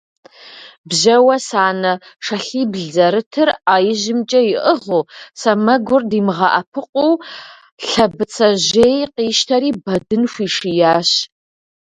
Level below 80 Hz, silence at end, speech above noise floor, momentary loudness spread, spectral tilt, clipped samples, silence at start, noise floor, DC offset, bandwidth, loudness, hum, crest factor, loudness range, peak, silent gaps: -54 dBFS; 0.7 s; 24 dB; 9 LU; -4 dB/octave; under 0.1%; 0.45 s; -39 dBFS; under 0.1%; 11 kHz; -15 LUFS; none; 16 dB; 1 LU; 0 dBFS; 0.78-0.84 s, 3.26-3.31 s, 6.67-6.72 s, 6.89-6.93 s, 7.72-7.78 s